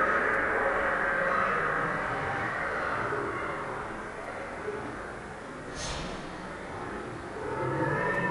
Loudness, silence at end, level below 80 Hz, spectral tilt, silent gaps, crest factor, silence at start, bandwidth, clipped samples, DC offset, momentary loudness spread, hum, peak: -31 LUFS; 0 s; -52 dBFS; -5 dB/octave; none; 16 dB; 0 s; 11 kHz; under 0.1%; under 0.1%; 12 LU; none; -14 dBFS